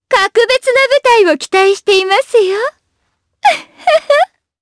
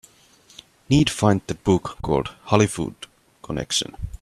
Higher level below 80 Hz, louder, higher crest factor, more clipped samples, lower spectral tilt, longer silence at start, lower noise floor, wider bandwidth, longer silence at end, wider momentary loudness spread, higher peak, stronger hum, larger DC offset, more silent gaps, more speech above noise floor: second, -56 dBFS vs -42 dBFS; first, -11 LUFS vs -22 LUFS; second, 12 dB vs 22 dB; neither; second, -1.5 dB/octave vs -5 dB/octave; second, 0.1 s vs 0.9 s; first, -66 dBFS vs -54 dBFS; second, 11 kHz vs 13.5 kHz; first, 0.35 s vs 0.05 s; second, 6 LU vs 13 LU; about the same, 0 dBFS vs 0 dBFS; neither; neither; neither; first, 55 dB vs 32 dB